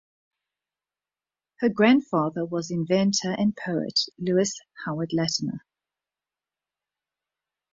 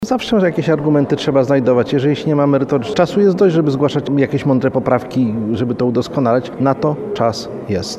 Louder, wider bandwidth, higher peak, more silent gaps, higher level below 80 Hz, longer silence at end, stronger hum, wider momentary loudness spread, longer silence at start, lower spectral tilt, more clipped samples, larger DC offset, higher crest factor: second, -25 LUFS vs -15 LUFS; second, 7.8 kHz vs 12.5 kHz; second, -6 dBFS vs 0 dBFS; neither; second, -66 dBFS vs -50 dBFS; first, 2.15 s vs 0 s; first, 50 Hz at -50 dBFS vs none; first, 11 LU vs 5 LU; first, 1.6 s vs 0 s; second, -4.5 dB/octave vs -7 dB/octave; neither; neither; first, 22 dB vs 14 dB